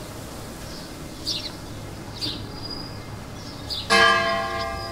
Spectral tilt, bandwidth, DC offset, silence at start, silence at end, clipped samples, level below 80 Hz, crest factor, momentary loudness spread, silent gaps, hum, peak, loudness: -3 dB/octave; 16 kHz; under 0.1%; 0 s; 0 s; under 0.1%; -44 dBFS; 22 dB; 19 LU; none; none; -4 dBFS; -23 LUFS